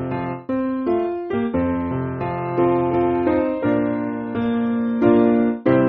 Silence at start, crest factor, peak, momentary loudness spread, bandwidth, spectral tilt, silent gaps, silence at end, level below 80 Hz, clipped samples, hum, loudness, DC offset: 0 s; 16 dB; -4 dBFS; 8 LU; 4.4 kHz; -7.5 dB/octave; none; 0 s; -48 dBFS; under 0.1%; none; -20 LUFS; under 0.1%